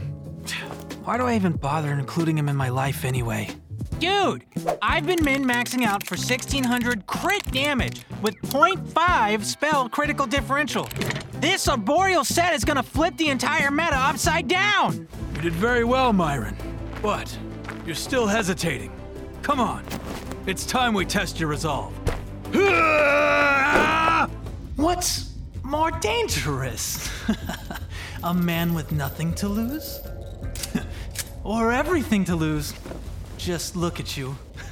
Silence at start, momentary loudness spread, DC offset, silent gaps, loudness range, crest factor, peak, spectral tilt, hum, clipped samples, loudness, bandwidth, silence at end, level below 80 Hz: 0 s; 14 LU; under 0.1%; none; 6 LU; 20 dB; -4 dBFS; -4.5 dB/octave; none; under 0.1%; -23 LUFS; 17.5 kHz; 0 s; -38 dBFS